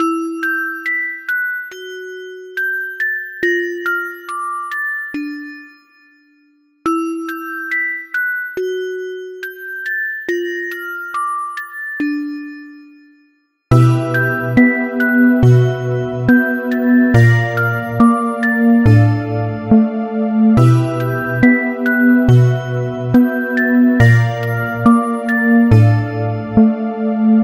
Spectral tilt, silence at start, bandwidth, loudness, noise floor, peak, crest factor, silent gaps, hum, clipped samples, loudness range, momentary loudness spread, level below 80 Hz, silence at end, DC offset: -8 dB/octave; 0 s; 15.5 kHz; -15 LUFS; -58 dBFS; 0 dBFS; 14 dB; none; none; under 0.1%; 9 LU; 14 LU; -40 dBFS; 0 s; under 0.1%